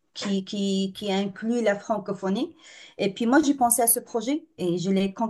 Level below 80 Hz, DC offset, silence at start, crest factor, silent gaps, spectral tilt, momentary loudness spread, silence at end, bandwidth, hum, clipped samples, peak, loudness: -68 dBFS; under 0.1%; 0.15 s; 20 dB; none; -4 dB/octave; 9 LU; 0 s; 13 kHz; none; under 0.1%; -6 dBFS; -25 LUFS